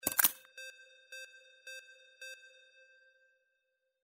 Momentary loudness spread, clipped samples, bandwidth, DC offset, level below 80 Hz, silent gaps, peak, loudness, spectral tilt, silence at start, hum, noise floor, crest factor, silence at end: 27 LU; under 0.1%; 16 kHz; under 0.1%; -76 dBFS; none; -4 dBFS; -30 LUFS; 0.5 dB/octave; 0.05 s; none; -83 dBFS; 38 dB; 1.55 s